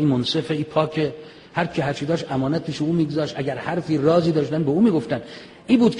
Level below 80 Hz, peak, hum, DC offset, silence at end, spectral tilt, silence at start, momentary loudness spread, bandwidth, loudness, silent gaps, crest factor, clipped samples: -56 dBFS; -4 dBFS; none; under 0.1%; 0 s; -7 dB/octave; 0 s; 10 LU; 10 kHz; -22 LUFS; none; 18 dB; under 0.1%